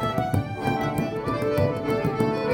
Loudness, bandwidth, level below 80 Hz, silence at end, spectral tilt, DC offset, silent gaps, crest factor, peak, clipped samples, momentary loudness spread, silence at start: -25 LUFS; 17 kHz; -46 dBFS; 0 s; -7 dB/octave; under 0.1%; none; 16 dB; -8 dBFS; under 0.1%; 3 LU; 0 s